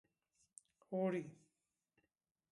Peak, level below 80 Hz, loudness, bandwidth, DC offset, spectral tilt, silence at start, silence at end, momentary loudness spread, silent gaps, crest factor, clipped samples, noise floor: -28 dBFS; under -90 dBFS; -42 LUFS; 11 kHz; under 0.1%; -7.5 dB/octave; 0.9 s; 1.15 s; 24 LU; none; 20 dB; under 0.1%; -89 dBFS